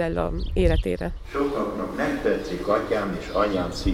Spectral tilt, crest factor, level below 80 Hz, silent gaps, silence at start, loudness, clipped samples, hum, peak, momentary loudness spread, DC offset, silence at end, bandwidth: -6.5 dB/octave; 16 dB; -32 dBFS; none; 0 s; -25 LUFS; under 0.1%; none; -8 dBFS; 5 LU; under 0.1%; 0 s; 16 kHz